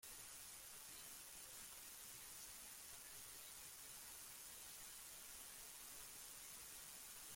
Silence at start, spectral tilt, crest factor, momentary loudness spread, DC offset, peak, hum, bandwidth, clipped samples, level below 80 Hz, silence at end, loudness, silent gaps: 0 s; 0.5 dB/octave; 16 dB; 1 LU; under 0.1%; -42 dBFS; none; 16.5 kHz; under 0.1%; -78 dBFS; 0 s; -55 LUFS; none